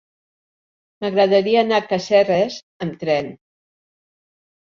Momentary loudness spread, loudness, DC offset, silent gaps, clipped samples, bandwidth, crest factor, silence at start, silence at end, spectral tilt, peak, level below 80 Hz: 13 LU; -18 LUFS; under 0.1%; 2.63-2.80 s; under 0.1%; 7.4 kHz; 18 dB; 1 s; 1.45 s; -5.5 dB/octave; -4 dBFS; -64 dBFS